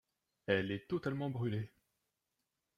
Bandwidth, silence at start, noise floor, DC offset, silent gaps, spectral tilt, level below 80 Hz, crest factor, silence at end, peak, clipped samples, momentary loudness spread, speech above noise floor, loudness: 13 kHz; 0.5 s; -87 dBFS; under 0.1%; none; -8 dB/octave; -72 dBFS; 22 dB; 1.1 s; -18 dBFS; under 0.1%; 11 LU; 50 dB; -38 LUFS